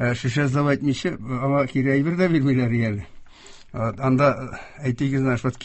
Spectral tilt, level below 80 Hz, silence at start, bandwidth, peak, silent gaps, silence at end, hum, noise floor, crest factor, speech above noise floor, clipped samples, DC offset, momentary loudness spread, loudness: -7.5 dB/octave; -48 dBFS; 0 s; 8.4 kHz; -6 dBFS; none; 0 s; none; -44 dBFS; 16 dB; 23 dB; under 0.1%; under 0.1%; 9 LU; -22 LUFS